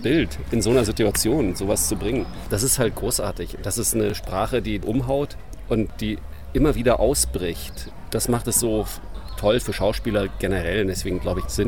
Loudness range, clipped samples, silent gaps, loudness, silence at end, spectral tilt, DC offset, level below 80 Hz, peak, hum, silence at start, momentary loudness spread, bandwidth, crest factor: 2 LU; under 0.1%; none; -23 LUFS; 0 s; -4.5 dB/octave; 1%; -34 dBFS; -6 dBFS; none; 0 s; 10 LU; 18 kHz; 16 dB